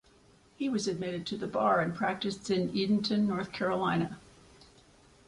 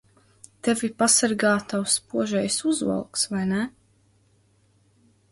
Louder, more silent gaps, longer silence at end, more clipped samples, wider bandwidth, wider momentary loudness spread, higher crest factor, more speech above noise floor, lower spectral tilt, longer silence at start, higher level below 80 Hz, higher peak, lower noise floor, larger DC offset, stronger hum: second, -31 LUFS vs -23 LUFS; neither; second, 1.1 s vs 1.65 s; neither; about the same, 11 kHz vs 12 kHz; about the same, 8 LU vs 8 LU; about the same, 18 dB vs 20 dB; second, 31 dB vs 39 dB; first, -5.5 dB/octave vs -3 dB/octave; about the same, 0.6 s vs 0.65 s; about the same, -64 dBFS vs -64 dBFS; second, -14 dBFS vs -6 dBFS; about the same, -62 dBFS vs -62 dBFS; neither; neither